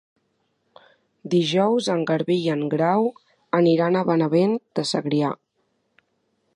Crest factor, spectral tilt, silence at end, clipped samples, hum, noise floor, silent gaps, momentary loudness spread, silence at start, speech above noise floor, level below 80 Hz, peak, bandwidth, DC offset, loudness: 18 dB; -6.5 dB/octave; 1.2 s; under 0.1%; none; -71 dBFS; none; 6 LU; 1.25 s; 50 dB; -72 dBFS; -4 dBFS; 11 kHz; under 0.1%; -21 LUFS